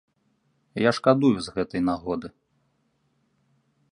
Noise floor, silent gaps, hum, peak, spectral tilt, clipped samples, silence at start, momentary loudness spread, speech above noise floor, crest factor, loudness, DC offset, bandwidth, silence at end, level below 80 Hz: -70 dBFS; none; none; -4 dBFS; -6.5 dB/octave; under 0.1%; 0.75 s; 14 LU; 47 dB; 24 dB; -24 LUFS; under 0.1%; 11 kHz; 1.65 s; -56 dBFS